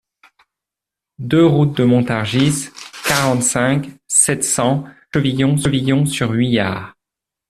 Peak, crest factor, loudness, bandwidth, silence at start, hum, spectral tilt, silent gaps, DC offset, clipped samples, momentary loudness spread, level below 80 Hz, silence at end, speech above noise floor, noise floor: 0 dBFS; 16 dB; -16 LUFS; 14 kHz; 1.2 s; none; -4.5 dB/octave; none; under 0.1%; under 0.1%; 10 LU; -50 dBFS; 0.6 s; 70 dB; -86 dBFS